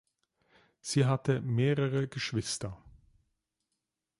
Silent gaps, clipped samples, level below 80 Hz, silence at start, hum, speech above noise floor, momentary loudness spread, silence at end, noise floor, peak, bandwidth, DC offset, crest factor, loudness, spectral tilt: none; under 0.1%; -62 dBFS; 0.85 s; none; 56 dB; 9 LU; 1.3 s; -86 dBFS; -14 dBFS; 11.5 kHz; under 0.1%; 18 dB; -31 LUFS; -5.5 dB/octave